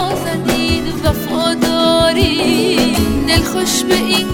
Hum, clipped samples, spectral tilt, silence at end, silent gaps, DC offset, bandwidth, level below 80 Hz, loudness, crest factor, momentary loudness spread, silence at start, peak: none; under 0.1%; -4 dB/octave; 0 s; none; under 0.1%; 18 kHz; -28 dBFS; -14 LUFS; 14 dB; 5 LU; 0 s; 0 dBFS